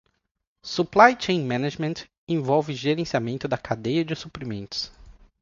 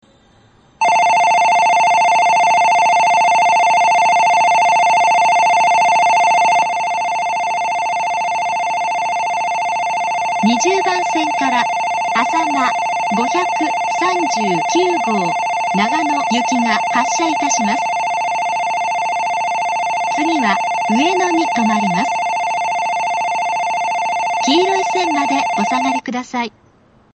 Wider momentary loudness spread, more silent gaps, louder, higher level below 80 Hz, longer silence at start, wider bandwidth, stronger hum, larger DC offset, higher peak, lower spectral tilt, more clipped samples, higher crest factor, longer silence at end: first, 16 LU vs 6 LU; first, 2.18-2.27 s vs none; second, -24 LUFS vs -15 LUFS; about the same, -56 dBFS vs -60 dBFS; second, 0.65 s vs 0.8 s; second, 7.6 kHz vs 8.8 kHz; neither; neither; about the same, 0 dBFS vs 0 dBFS; first, -5.5 dB/octave vs -3 dB/octave; neither; first, 24 dB vs 14 dB; second, 0.3 s vs 0.65 s